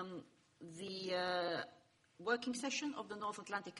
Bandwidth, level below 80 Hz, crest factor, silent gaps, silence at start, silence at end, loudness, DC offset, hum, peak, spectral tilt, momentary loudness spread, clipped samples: 11.5 kHz; -84 dBFS; 20 dB; none; 0 s; 0 s; -42 LUFS; under 0.1%; none; -22 dBFS; -3 dB/octave; 14 LU; under 0.1%